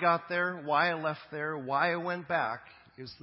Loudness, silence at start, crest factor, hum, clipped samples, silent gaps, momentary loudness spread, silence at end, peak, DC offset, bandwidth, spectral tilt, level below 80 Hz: -31 LUFS; 0 s; 18 dB; none; under 0.1%; none; 10 LU; 0.1 s; -12 dBFS; under 0.1%; 5.8 kHz; -9 dB/octave; -74 dBFS